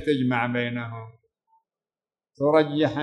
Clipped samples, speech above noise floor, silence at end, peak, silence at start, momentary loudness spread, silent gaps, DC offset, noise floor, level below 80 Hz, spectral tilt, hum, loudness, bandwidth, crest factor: under 0.1%; over 67 dB; 0 s; -6 dBFS; 0 s; 14 LU; none; under 0.1%; under -90 dBFS; -66 dBFS; -7.5 dB/octave; none; -24 LUFS; 9.8 kHz; 20 dB